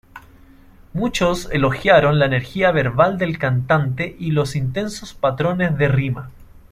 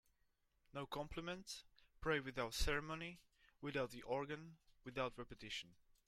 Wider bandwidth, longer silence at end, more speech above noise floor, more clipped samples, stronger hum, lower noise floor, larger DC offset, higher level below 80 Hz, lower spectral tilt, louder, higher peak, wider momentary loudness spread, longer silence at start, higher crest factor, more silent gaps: second, 14.5 kHz vs 16 kHz; second, 0.15 s vs 0.35 s; second, 28 dB vs 36 dB; neither; neither; second, -46 dBFS vs -81 dBFS; neither; first, -40 dBFS vs -58 dBFS; first, -6.5 dB/octave vs -4 dB/octave; first, -19 LUFS vs -46 LUFS; first, -2 dBFS vs -26 dBFS; about the same, 11 LU vs 13 LU; second, 0.15 s vs 0.75 s; about the same, 18 dB vs 20 dB; neither